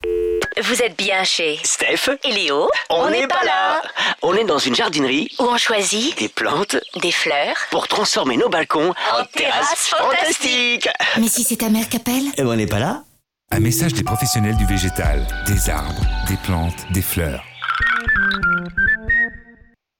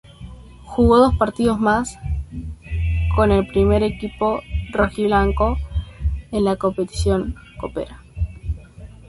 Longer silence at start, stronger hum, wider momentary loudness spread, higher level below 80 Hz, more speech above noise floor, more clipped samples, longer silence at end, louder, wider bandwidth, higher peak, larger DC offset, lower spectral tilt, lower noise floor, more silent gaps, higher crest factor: second, 0 s vs 0.2 s; neither; second, 5 LU vs 14 LU; about the same, -32 dBFS vs -28 dBFS; first, 31 dB vs 22 dB; neither; first, 0.6 s vs 0.2 s; about the same, -18 LUFS vs -20 LUFS; first, 19 kHz vs 11.5 kHz; second, -8 dBFS vs -2 dBFS; neither; second, -3.5 dB/octave vs -7 dB/octave; first, -49 dBFS vs -40 dBFS; neither; second, 10 dB vs 18 dB